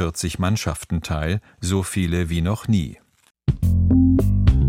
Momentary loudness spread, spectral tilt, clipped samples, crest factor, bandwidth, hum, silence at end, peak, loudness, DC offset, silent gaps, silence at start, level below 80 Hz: 9 LU; -6.5 dB/octave; under 0.1%; 18 dB; 16 kHz; none; 0 s; -2 dBFS; -21 LUFS; under 0.1%; none; 0 s; -28 dBFS